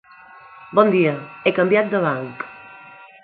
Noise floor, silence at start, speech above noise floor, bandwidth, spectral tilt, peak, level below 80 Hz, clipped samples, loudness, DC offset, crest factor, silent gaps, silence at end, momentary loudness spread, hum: -45 dBFS; 0.6 s; 26 dB; 4.6 kHz; -11 dB/octave; 0 dBFS; -68 dBFS; under 0.1%; -19 LUFS; under 0.1%; 20 dB; none; 0.2 s; 17 LU; none